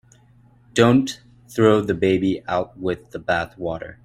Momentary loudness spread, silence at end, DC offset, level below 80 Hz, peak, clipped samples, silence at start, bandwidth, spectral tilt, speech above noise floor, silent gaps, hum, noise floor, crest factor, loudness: 13 LU; 0.1 s; under 0.1%; -52 dBFS; -2 dBFS; under 0.1%; 0.75 s; 14 kHz; -6 dB/octave; 33 dB; none; none; -53 dBFS; 20 dB; -21 LUFS